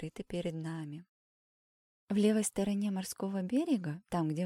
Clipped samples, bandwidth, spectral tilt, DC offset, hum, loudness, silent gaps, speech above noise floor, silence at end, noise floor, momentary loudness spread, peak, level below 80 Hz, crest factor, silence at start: under 0.1%; 16 kHz; -6 dB/octave; under 0.1%; none; -34 LUFS; 1.09-2.07 s; over 56 dB; 0 s; under -90 dBFS; 11 LU; -16 dBFS; -66 dBFS; 18 dB; 0 s